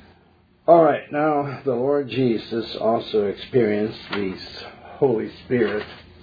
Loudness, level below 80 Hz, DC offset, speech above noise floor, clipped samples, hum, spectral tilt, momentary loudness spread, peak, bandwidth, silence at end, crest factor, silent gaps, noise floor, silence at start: -22 LUFS; -58 dBFS; under 0.1%; 35 dB; under 0.1%; none; -8.5 dB/octave; 13 LU; -2 dBFS; 5 kHz; 0.2 s; 20 dB; none; -56 dBFS; 0.7 s